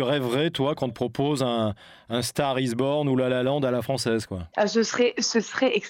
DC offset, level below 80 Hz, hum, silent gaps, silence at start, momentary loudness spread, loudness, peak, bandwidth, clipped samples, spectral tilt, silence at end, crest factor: under 0.1%; -60 dBFS; none; none; 0 s; 6 LU; -25 LUFS; -10 dBFS; 17 kHz; under 0.1%; -5 dB/octave; 0 s; 14 dB